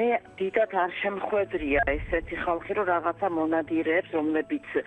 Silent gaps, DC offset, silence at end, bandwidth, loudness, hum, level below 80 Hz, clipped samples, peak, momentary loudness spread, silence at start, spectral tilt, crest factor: none; under 0.1%; 0 s; 8.4 kHz; -27 LUFS; none; -46 dBFS; under 0.1%; -10 dBFS; 4 LU; 0 s; -7.5 dB/octave; 16 dB